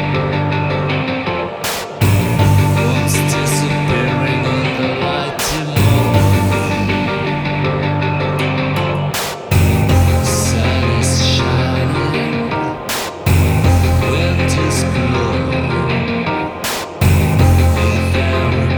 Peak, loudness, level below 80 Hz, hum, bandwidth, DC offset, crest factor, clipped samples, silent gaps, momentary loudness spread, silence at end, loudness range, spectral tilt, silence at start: 0 dBFS; -15 LUFS; -28 dBFS; none; over 20 kHz; under 0.1%; 14 dB; under 0.1%; none; 6 LU; 0 s; 1 LU; -5.5 dB/octave; 0 s